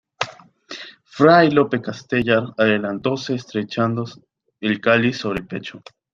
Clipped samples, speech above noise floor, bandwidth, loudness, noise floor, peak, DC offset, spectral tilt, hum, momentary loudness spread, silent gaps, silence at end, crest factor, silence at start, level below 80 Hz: under 0.1%; 21 dB; 7.6 kHz; -19 LUFS; -40 dBFS; -2 dBFS; under 0.1%; -6 dB/octave; none; 21 LU; none; 0.35 s; 18 dB; 0.2 s; -56 dBFS